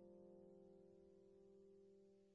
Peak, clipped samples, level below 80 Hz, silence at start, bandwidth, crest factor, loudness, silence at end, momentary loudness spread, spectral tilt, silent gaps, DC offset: -54 dBFS; under 0.1%; -88 dBFS; 0 s; 4.8 kHz; 12 dB; -68 LUFS; 0 s; 5 LU; -9 dB/octave; none; under 0.1%